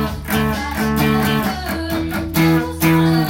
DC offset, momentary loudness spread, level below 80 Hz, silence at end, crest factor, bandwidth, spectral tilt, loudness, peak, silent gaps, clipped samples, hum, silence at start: under 0.1%; 6 LU; -34 dBFS; 0 s; 14 dB; 17 kHz; -5.5 dB/octave; -18 LUFS; -2 dBFS; none; under 0.1%; none; 0 s